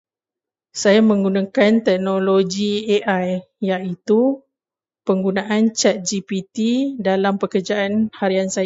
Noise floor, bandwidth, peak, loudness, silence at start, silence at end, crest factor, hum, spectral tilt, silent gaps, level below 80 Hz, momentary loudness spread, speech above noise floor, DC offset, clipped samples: under -90 dBFS; 8 kHz; -2 dBFS; -19 LUFS; 0.75 s; 0 s; 16 dB; none; -5 dB/octave; none; -62 dBFS; 8 LU; over 72 dB; under 0.1%; under 0.1%